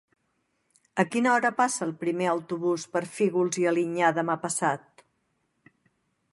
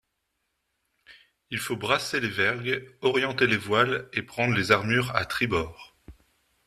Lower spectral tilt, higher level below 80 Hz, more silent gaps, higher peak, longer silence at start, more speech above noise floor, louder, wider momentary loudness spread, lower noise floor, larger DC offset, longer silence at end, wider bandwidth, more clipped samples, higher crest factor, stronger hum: about the same, -4.5 dB/octave vs -4.5 dB/octave; second, -78 dBFS vs -56 dBFS; neither; about the same, -6 dBFS vs -4 dBFS; second, 0.95 s vs 1.1 s; about the same, 49 dB vs 52 dB; about the same, -26 LUFS vs -25 LUFS; about the same, 7 LU vs 9 LU; second, -74 dBFS vs -78 dBFS; neither; first, 1.55 s vs 0.55 s; second, 11.5 kHz vs 14 kHz; neither; about the same, 22 dB vs 24 dB; neither